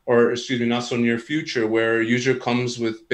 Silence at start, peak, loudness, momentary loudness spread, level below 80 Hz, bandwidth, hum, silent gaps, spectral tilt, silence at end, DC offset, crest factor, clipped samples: 0.05 s; -6 dBFS; -22 LUFS; 6 LU; -64 dBFS; 9.2 kHz; none; none; -5 dB/octave; 0 s; under 0.1%; 16 dB; under 0.1%